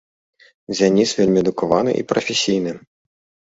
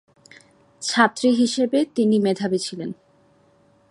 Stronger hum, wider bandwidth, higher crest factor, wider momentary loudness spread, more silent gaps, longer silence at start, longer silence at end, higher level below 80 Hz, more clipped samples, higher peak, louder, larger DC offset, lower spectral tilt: neither; second, 8 kHz vs 11.5 kHz; about the same, 18 dB vs 22 dB; second, 10 LU vs 14 LU; neither; about the same, 0.7 s vs 0.8 s; second, 0.75 s vs 0.95 s; first, -54 dBFS vs -70 dBFS; neither; about the same, -2 dBFS vs -2 dBFS; about the same, -18 LUFS vs -20 LUFS; neither; about the same, -4.5 dB/octave vs -4.5 dB/octave